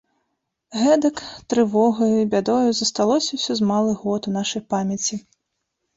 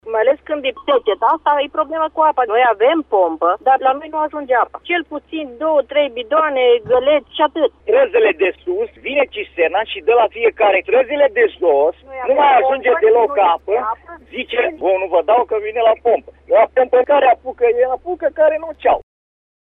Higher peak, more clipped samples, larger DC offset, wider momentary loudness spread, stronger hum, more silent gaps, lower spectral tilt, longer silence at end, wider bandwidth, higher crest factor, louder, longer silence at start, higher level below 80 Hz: about the same, -6 dBFS vs -4 dBFS; neither; neither; about the same, 7 LU vs 8 LU; neither; neither; second, -4.5 dB/octave vs -6.5 dB/octave; about the same, 0.75 s vs 0.7 s; first, 8 kHz vs 3.9 kHz; about the same, 16 dB vs 12 dB; second, -20 LUFS vs -16 LUFS; first, 0.7 s vs 0.05 s; second, -60 dBFS vs -52 dBFS